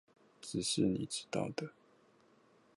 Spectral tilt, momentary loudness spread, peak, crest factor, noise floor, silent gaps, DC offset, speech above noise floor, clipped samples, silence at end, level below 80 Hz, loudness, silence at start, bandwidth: -4.5 dB/octave; 14 LU; -20 dBFS; 20 dB; -68 dBFS; none; under 0.1%; 31 dB; under 0.1%; 1.05 s; -68 dBFS; -37 LUFS; 0.4 s; 11.5 kHz